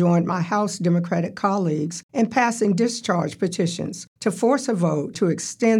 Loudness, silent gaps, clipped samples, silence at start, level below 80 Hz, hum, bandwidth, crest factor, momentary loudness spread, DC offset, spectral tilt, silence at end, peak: -22 LUFS; 2.03-2.09 s, 4.07-4.16 s; under 0.1%; 0 s; -70 dBFS; none; 12.5 kHz; 16 dB; 6 LU; under 0.1%; -6 dB/octave; 0 s; -6 dBFS